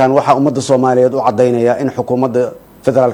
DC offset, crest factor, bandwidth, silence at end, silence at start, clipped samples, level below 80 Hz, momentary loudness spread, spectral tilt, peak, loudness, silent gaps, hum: under 0.1%; 12 dB; 16.5 kHz; 0 s; 0 s; under 0.1%; -52 dBFS; 6 LU; -6.5 dB/octave; 0 dBFS; -13 LUFS; none; none